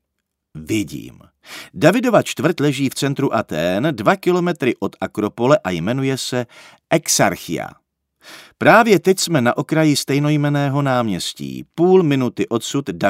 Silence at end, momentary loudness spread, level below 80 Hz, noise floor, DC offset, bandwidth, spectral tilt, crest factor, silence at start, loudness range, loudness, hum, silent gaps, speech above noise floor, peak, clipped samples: 0 s; 12 LU; -56 dBFS; -76 dBFS; under 0.1%; 16 kHz; -5 dB/octave; 18 dB; 0.55 s; 4 LU; -17 LUFS; none; none; 59 dB; 0 dBFS; under 0.1%